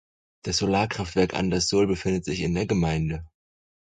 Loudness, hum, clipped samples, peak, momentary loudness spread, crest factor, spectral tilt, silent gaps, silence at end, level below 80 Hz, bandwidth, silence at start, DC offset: -25 LUFS; none; under 0.1%; -8 dBFS; 6 LU; 18 dB; -5 dB/octave; none; 0.55 s; -42 dBFS; 9.4 kHz; 0.45 s; under 0.1%